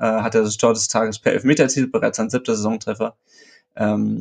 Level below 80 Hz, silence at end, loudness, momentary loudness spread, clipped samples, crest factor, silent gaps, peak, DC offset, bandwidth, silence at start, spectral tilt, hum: -62 dBFS; 0 s; -19 LUFS; 7 LU; under 0.1%; 18 dB; none; -2 dBFS; under 0.1%; 9.6 kHz; 0 s; -4.5 dB/octave; none